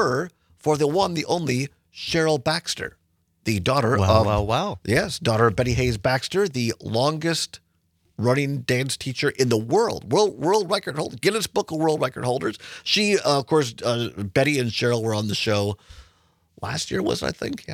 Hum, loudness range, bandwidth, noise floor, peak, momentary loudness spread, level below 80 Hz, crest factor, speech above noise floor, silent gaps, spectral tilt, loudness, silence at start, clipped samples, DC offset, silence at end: none; 3 LU; 16 kHz; -66 dBFS; -4 dBFS; 9 LU; -48 dBFS; 20 dB; 44 dB; none; -5 dB/octave; -23 LUFS; 0 s; under 0.1%; under 0.1%; 0 s